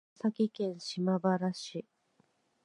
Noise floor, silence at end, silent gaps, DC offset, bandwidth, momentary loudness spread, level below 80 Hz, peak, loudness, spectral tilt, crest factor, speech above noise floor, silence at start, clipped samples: -73 dBFS; 0.85 s; none; under 0.1%; 11 kHz; 11 LU; -86 dBFS; -16 dBFS; -33 LUFS; -6.5 dB/octave; 18 dB; 40 dB; 0.25 s; under 0.1%